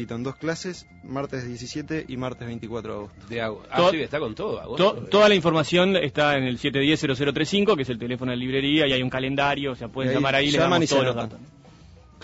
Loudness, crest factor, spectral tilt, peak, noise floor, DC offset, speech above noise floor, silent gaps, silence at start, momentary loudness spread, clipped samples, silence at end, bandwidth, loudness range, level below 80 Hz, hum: -23 LUFS; 16 dB; -5 dB/octave; -8 dBFS; -49 dBFS; under 0.1%; 26 dB; none; 0 s; 13 LU; under 0.1%; 0.3 s; 8 kHz; 7 LU; -52 dBFS; none